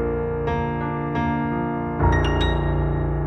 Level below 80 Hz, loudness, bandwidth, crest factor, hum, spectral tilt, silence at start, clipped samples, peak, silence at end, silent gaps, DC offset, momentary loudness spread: -28 dBFS; -23 LUFS; 8.2 kHz; 16 dB; none; -8 dB/octave; 0 s; under 0.1%; -6 dBFS; 0 s; none; under 0.1%; 5 LU